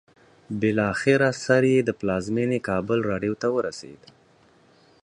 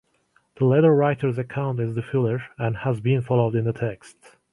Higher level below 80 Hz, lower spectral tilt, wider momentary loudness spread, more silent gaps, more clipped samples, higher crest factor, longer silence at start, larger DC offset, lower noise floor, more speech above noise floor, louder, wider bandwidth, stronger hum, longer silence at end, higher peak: about the same, -56 dBFS vs -58 dBFS; second, -6 dB/octave vs -9 dB/octave; second, 7 LU vs 10 LU; neither; neither; about the same, 20 dB vs 16 dB; about the same, 0.5 s vs 0.6 s; neither; second, -58 dBFS vs -65 dBFS; second, 35 dB vs 43 dB; about the same, -23 LUFS vs -23 LUFS; about the same, 10.5 kHz vs 11 kHz; neither; first, 1.1 s vs 0.4 s; about the same, -4 dBFS vs -6 dBFS